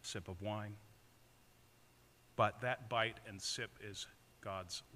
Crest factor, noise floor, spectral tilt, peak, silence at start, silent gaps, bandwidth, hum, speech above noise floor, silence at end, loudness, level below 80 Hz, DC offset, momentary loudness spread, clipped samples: 26 dB; -68 dBFS; -3.5 dB/octave; -20 dBFS; 0.05 s; none; 15.5 kHz; none; 26 dB; 0 s; -42 LUFS; -74 dBFS; under 0.1%; 14 LU; under 0.1%